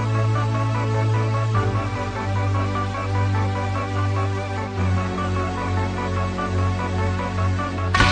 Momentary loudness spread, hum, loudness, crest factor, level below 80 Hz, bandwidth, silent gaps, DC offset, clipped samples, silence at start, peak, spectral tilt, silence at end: 3 LU; none; -23 LUFS; 20 dB; -38 dBFS; 9.2 kHz; none; under 0.1%; under 0.1%; 0 s; -2 dBFS; -6.5 dB/octave; 0 s